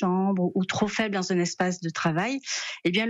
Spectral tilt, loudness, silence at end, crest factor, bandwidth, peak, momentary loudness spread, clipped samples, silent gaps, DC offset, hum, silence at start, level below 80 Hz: -4.5 dB/octave; -26 LUFS; 0 s; 16 dB; 8 kHz; -10 dBFS; 3 LU; under 0.1%; none; under 0.1%; none; 0 s; -62 dBFS